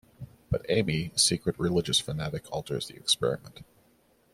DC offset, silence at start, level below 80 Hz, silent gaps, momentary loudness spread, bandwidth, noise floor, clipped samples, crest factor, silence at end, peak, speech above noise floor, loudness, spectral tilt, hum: under 0.1%; 0.2 s; -52 dBFS; none; 12 LU; 16 kHz; -65 dBFS; under 0.1%; 22 dB; 0.7 s; -8 dBFS; 36 dB; -28 LUFS; -3.5 dB/octave; none